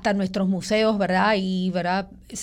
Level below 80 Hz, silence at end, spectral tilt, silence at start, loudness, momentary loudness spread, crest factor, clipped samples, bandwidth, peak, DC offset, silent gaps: -52 dBFS; 0 s; -5.5 dB/octave; 0 s; -23 LUFS; 6 LU; 14 dB; under 0.1%; 11 kHz; -10 dBFS; under 0.1%; none